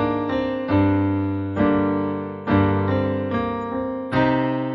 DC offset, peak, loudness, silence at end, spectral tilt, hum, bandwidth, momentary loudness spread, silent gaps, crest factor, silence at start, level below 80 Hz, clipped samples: under 0.1%; -6 dBFS; -22 LUFS; 0 s; -9.5 dB/octave; none; 5.8 kHz; 7 LU; none; 14 dB; 0 s; -46 dBFS; under 0.1%